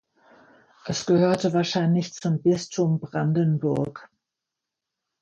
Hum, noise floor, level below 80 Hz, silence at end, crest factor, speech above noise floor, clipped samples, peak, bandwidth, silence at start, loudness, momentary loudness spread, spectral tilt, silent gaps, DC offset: none; -85 dBFS; -62 dBFS; 1.15 s; 16 dB; 63 dB; under 0.1%; -8 dBFS; 9.2 kHz; 0.85 s; -24 LUFS; 8 LU; -6.5 dB/octave; none; under 0.1%